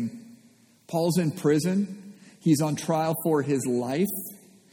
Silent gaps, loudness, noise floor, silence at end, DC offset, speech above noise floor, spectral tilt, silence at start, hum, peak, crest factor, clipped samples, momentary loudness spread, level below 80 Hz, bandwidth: none; -26 LUFS; -58 dBFS; 0.35 s; under 0.1%; 33 dB; -6 dB/octave; 0 s; none; -10 dBFS; 16 dB; under 0.1%; 11 LU; -70 dBFS; 19 kHz